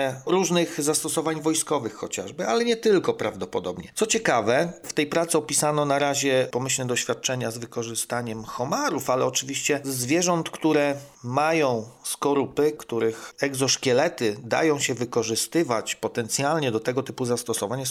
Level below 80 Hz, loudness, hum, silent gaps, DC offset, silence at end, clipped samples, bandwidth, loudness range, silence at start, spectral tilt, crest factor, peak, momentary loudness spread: -64 dBFS; -24 LUFS; none; none; under 0.1%; 0 s; under 0.1%; 16 kHz; 2 LU; 0 s; -3.5 dB/octave; 18 dB; -8 dBFS; 7 LU